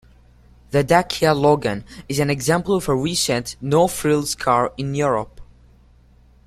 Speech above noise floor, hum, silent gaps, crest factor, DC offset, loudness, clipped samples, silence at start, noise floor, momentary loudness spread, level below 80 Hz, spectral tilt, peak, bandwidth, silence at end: 32 dB; none; none; 18 dB; under 0.1%; -19 LUFS; under 0.1%; 0.7 s; -51 dBFS; 7 LU; -46 dBFS; -4.5 dB/octave; -2 dBFS; 15 kHz; 1.05 s